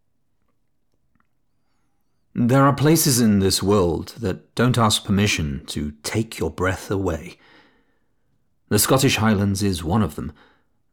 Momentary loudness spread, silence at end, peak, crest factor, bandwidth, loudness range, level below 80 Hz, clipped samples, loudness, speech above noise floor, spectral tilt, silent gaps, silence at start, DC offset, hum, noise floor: 12 LU; 0.6 s; -6 dBFS; 16 dB; over 20 kHz; 6 LU; -44 dBFS; under 0.1%; -20 LUFS; 53 dB; -5 dB/octave; none; 2.35 s; under 0.1%; none; -72 dBFS